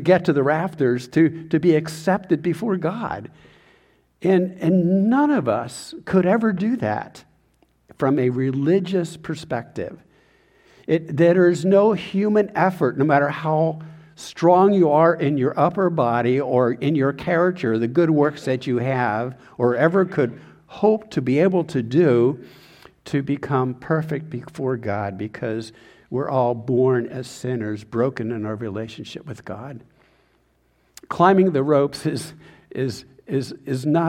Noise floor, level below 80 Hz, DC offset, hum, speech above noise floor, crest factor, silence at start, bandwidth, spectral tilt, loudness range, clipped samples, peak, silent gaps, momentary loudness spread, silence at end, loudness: -63 dBFS; -60 dBFS; under 0.1%; none; 43 dB; 18 dB; 0 s; 13 kHz; -7.5 dB/octave; 6 LU; under 0.1%; -2 dBFS; none; 14 LU; 0 s; -20 LUFS